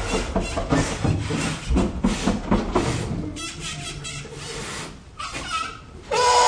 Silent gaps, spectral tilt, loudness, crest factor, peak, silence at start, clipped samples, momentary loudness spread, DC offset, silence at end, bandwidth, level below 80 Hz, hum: none; -4.5 dB/octave; -25 LUFS; 18 dB; -6 dBFS; 0 s; under 0.1%; 10 LU; under 0.1%; 0 s; 10.5 kHz; -34 dBFS; none